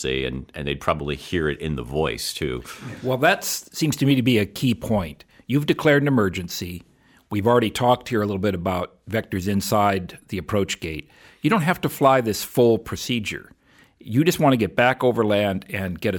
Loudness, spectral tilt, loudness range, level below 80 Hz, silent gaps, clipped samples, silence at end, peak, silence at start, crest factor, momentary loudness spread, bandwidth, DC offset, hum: -22 LUFS; -5.5 dB/octave; 3 LU; -46 dBFS; none; under 0.1%; 0 s; -4 dBFS; 0 s; 18 dB; 12 LU; 19 kHz; under 0.1%; none